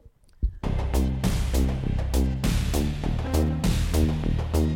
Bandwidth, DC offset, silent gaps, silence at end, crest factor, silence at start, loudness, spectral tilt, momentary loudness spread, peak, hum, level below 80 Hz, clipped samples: 17 kHz; under 0.1%; none; 0 s; 14 dB; 0.05 s; -26 LUFS; -6.5 dB/octave; 5 LU; -10 dBFS; none; -26 dBFS; under 0.1%